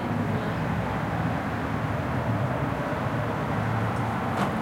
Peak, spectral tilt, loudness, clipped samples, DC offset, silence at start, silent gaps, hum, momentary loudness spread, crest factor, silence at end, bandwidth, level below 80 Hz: -12 dBFS; -7.5 dB/octave; -28 LUFS; under 0.1%; under 0.1%; 0 s; none; none; 1 LU; 16 dB; 0 s; 16.5 kHz; -46 dBFS